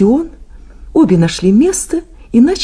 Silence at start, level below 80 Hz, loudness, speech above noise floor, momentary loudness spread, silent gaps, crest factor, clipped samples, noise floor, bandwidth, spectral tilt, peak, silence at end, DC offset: 0 s; -34 dBFS; -12 LUFS; 23 dB; 10 LU; none; 12 dB; under 0.1%; -34 dBFS; 11 kHz; -6 dB/octave; 0 dBFS; 0 s; under 0.1%